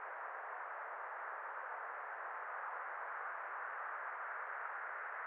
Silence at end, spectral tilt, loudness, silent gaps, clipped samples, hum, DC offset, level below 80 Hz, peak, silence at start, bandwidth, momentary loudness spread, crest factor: 0 s; 4.5 dB/octave; -45 LUFS; none; under 0.1%; none; under 0.1%; under -90 dBFS; -32 dBFS; 0 s; 4 kHz; 2 LU; 14 dB